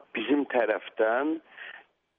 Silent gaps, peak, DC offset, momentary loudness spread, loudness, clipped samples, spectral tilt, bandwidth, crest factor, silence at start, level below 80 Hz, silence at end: none; -12 dBFS; under 0.1%; 18 LU; -28 LUFS; under 0.1%; -1.5 dB/octave; 4 kHz; 18 dB; 0.15 s; -82 dBFS; 0.4 s